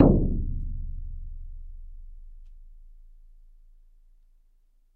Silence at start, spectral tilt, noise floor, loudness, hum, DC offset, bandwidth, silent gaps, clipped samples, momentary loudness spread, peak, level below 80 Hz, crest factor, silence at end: 0 s; -13.5 dB/octave; -61 dBFS; -29 LUFS; none; under 0.1%; 1.8 kHz; none; under 0.1%; 26 LU; -2 dBFS; -34 dBFS; 26 dB; 1.95 s